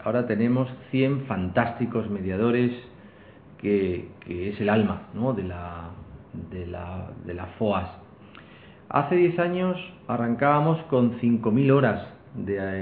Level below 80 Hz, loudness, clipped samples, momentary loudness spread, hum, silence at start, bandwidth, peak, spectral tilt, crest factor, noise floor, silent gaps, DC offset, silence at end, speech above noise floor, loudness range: -56 dBFS; -25 LUFS; under 0.1%; 15 LU; none; 0 s; 4.6 kHz; -6 dBFS; -11.5 dB/octave; 20 dB; -49 dBFS; none; under 0.1%; 0 s; 24 dB; 8 LU